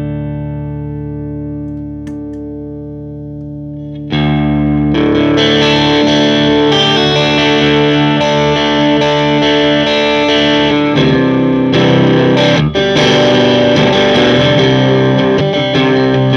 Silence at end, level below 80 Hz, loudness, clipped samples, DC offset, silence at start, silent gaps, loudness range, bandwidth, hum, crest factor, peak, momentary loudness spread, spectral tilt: 0 s; -34 dBFS; -10 LUFS; under 0.1%; under 0.1%; 0 s; none; 12 LU; 7.6 kHz; 60 Hz at -50 dBFS; 10 dB; 0 dBFS; 15 LU; -6 dB/octave